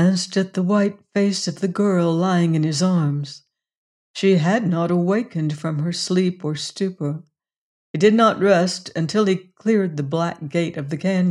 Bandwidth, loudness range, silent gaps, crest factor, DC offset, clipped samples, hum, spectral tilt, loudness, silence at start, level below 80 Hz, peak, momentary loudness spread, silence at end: 11 kHz; 2 LU; 3.77-4.14 s, 7.58-7.94 s; 16 dB; under 0.1%; under 0.1%; none; -6 dB/octave; -20 LUFS; 0 s; -68 dBFS; -4 dBFS; 8 LU; 0 s